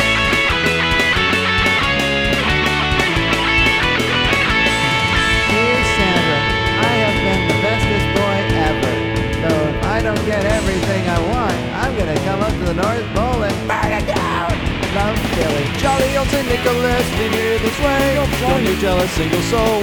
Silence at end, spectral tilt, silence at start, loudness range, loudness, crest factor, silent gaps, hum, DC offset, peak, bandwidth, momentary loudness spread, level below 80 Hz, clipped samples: 0 s; -4.5 dB/octave; 0 s; 4 LU; -16 LUFS; 16 dB; none; none; under 0.1%; 0 dBFS; over 20 kHz; 5 LU; -28 dBFS; under 0.1%